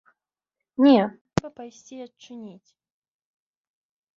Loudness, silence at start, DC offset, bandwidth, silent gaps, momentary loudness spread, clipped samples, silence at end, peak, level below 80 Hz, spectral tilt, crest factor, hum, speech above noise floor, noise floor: -21 LUFS; 0.8 s; under 0.1%; 7.6 kHz; 1.21-1.25 s; 24 LU; under 0.1%; 1.7 s; -2 dBFS; -58 dBFS; -6.5 dB/octave; 26 dB; none; 64 dB; -87 dBFS